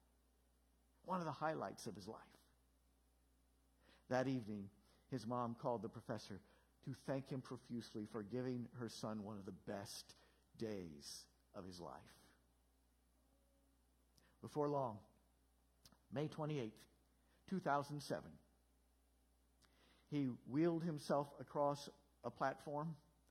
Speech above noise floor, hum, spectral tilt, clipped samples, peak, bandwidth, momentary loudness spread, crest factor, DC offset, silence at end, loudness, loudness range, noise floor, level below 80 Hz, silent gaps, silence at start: 32 dB; none; -6.5 dB/octave; under 0.1%; -24 dBFS; 16 kHz; 15 LU; 24 dB; under 0.1%; 0.3 s; -46 LUFS; 9 LU; -78 dBFS; -78 dBFS; none; 1.05 s